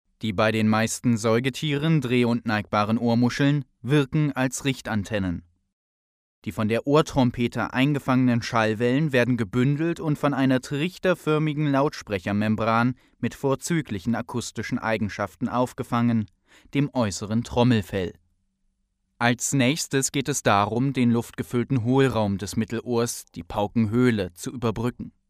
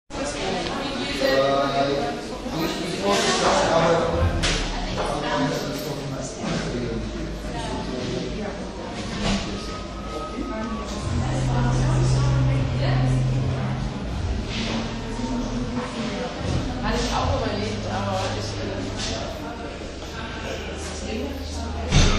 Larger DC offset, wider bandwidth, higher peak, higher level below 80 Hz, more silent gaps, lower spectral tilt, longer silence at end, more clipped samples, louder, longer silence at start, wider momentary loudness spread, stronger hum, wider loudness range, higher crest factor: neither; first, 15.5 kHz vs 13.5 kHz; about the same, -4 dBFS vs -4 dBFS; second, -52 dBFS vs -32 dBFS; first, 5.73-6.42 s vs none; about the same, -5.5 dB/octave vs -5 dB/octave; first, 0.2 s vs 0 s; neither; about the same, -24 LUFS vs -25 LUFS; about the same, 0.2 s vs 0.1 s; second, 8 LU vs 11 LU; neither; second, 4 LU vs 7 LU; about the same, 20 dB vs 20 dB